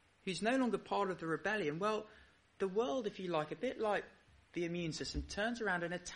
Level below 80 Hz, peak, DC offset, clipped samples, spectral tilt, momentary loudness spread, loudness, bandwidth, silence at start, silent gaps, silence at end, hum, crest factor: -58 dBFS; -22 dBFS; under 0.1%; under 0.1%; -5 dB/octave; 7 LU; -38 LUFS; 11 kHz; 0.25 s; none; 0 s; none; 16 dB